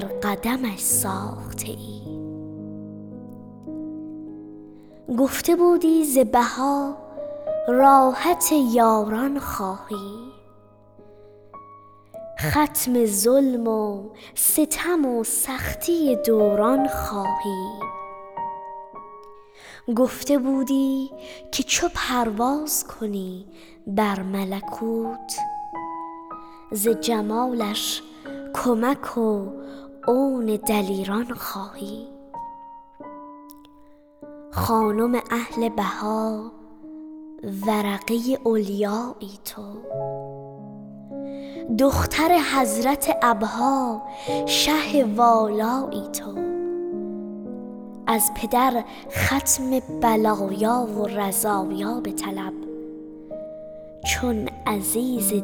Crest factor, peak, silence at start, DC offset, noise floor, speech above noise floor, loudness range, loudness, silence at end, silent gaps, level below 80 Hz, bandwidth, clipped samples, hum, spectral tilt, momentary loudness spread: 20 dB; -4 dBFS; 0 s; under 0.1%; -51 dBFS; 29 dB; 9 LU; -22 LUFS; 0 s; none; -48 dBFS; over 20 kHz; under 0.1%; none; -4 dB/octave; 19 LU